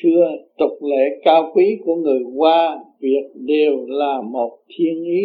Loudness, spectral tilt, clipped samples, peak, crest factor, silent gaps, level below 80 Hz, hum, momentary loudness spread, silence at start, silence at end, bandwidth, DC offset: -18 LUFS; -8.5 dB/octave; under 0.1%; 0 dBFS; 16 dB; none; -72 dBFS; none; 8 LU; 0 s; 0 s; 4.9 kHz; under 0.1%